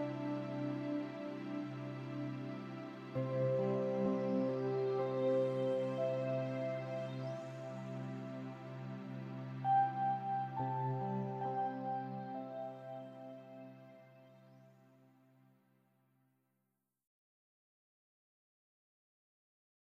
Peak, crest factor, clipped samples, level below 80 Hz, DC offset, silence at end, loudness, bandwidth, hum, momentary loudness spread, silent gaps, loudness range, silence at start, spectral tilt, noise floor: -24 dBFS; 16 dB; under 0.1%; -82 dBFS; under 0.1%; 5.1 s; -39 LUFS; 7.6 kHz; none; 13 LU; none; 13 LU; 0 s; -8.5 dB/octave; -86 dBFS